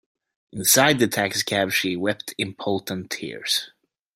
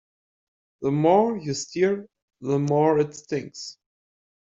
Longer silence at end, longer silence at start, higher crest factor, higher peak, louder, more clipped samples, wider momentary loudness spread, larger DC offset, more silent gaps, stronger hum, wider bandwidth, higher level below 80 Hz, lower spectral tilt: second, 0.45 s vs 0.7 s; second, 0.55 s vs 0.8 s; about the same, 22 dB vs 20 dB; first, -2 dBFS vs -6 dBFS; about the same, -22 LUFS vs -23 LUFS; neither; second, 14 LU vs 17 LU; neither; second, none vs 2.22-2.28 s; neither; first, 16.5 kHz vs 8 kHz; about the same, -64 dBFS vs -64 dBFS; second, -2.5 dB/octave vs -6 dB/octave